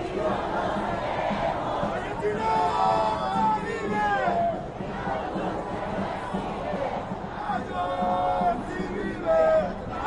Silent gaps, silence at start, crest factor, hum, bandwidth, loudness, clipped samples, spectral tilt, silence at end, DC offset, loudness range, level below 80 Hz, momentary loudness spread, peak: none; 0 s; 16 dB; none; 11 kHz; -27 LUFS; under 0.1%; -6.5 dB/octave; 0 s; under 0.1%; 4 LU; -46 dBFS; 8 LU; -12 dBFS